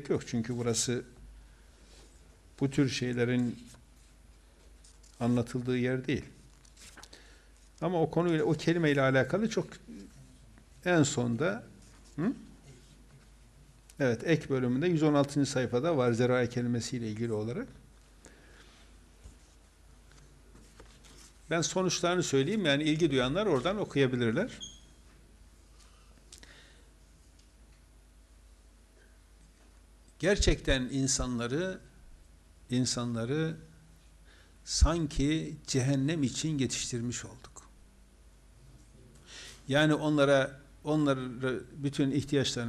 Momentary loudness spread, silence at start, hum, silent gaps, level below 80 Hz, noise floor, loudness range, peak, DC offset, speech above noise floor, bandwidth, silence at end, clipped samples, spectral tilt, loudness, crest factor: 19 LU; 0 s; none; none; -46 dBFS; -58 dBFS; 7 LU; -12 dBFS; under 0.1%; 29 dB; 13 kHz; 0 s; under 0.1%; -5 dB/octave; -30 LUFS; 20 dB